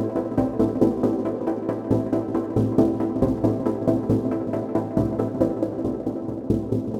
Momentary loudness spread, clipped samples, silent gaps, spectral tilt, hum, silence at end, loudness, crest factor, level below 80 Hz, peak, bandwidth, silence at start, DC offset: 5 LU; under 0.1%; none; -10 dB/octave; none; 0 s; -24 LUFS; 18 dB; -44 dBFS; -4 dBFS; 11 kHz; 0 s; under 0.1%